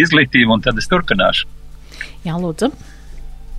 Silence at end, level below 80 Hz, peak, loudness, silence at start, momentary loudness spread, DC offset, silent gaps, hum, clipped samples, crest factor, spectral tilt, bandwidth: 0 s; -32 dBFS; 0 dBFS; -15 LUFS; 0 s; 17 LU; under 0.1%; none; none; under 0.1%; 16 dB; -5 dB/octave; 13 kHz